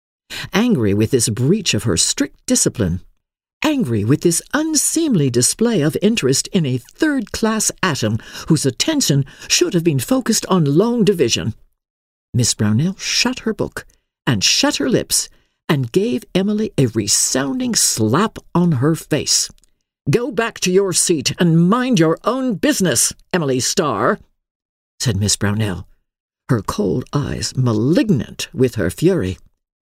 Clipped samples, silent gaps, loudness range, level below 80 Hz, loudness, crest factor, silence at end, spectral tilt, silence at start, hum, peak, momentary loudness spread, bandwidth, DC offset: under 0.1%; 3.53-3.61 s, 11.90-12.33 s, 24.51-24.98 s, 26.20-26.29 s; 3 LU; -46 dBFS; -17 LUFS; 16 dB; 0.55 s; -4 dB/octave; 0.3 s; none; -2 dBFS; 7 LU; 16 kHz; under 0.1%